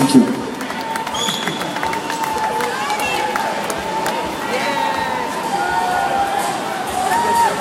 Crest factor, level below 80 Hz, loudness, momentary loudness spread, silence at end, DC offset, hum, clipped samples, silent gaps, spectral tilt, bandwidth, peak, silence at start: 18 dB; -50 dBFS; -19 LUFS; 6 LU; 0 s; under 0.1%; none; under 0.1%; none; -3.5 dB/octave; 17 kHz; 0 dBFS; 0 s